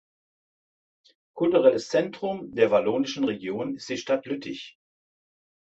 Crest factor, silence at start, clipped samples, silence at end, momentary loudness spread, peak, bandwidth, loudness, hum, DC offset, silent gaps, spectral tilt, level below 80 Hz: 20 dB; 1.35 s; under 0.1%; 1.05 s; 13 LU; -6 dBFS; 8 kHz; -25 LUFS; none; under 0.1%; none; -5 dB/octave; -70 dBFS